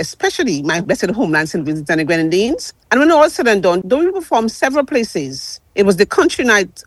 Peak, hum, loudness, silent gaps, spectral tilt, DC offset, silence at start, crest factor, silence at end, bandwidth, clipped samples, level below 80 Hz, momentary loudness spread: 0 dBFS; none; -15 LUFS; none; -4.5 dB/octave; under 0.1%; 0 s; 14 dB; 0.05 s; 12.5 kHz; under 0.1%; -48 dBFS; 9 LU